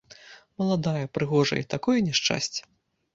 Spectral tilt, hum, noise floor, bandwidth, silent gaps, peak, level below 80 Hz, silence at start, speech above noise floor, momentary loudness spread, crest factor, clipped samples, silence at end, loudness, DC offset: -4.5 dB/octave; none; -50 dBFS; 7.8 kHz; none; -8 dBFS; -60 dBFS; 0.25 s; 25 dB; 8 LU; 20 dB; under 0.1%; 0.55 s; -26 LUFS; under 0.1%